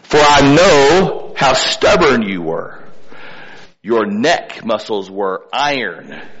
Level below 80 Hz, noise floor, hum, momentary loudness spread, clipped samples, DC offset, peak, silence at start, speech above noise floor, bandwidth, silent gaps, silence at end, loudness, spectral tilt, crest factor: -38 dBFS; -37 dBFS; none; 15 LU; under 0.1%; under 0.1%; -2 dBFS; 0.1 s; 23 dB; 8.2 kHz; none; 0 s; -13 LUFS; -4 dB/octave; 12 dB